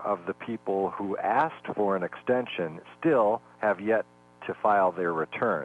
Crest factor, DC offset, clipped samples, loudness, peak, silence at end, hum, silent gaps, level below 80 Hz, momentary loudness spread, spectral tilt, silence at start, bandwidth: 16 dB; under 0.1%; under 0.1%; -28 LUFS; -12 dBFS; 0 s; none; none; -72 dBFS; 10 LU; -7.5 dB/octave; 0 s; 9.2 kHz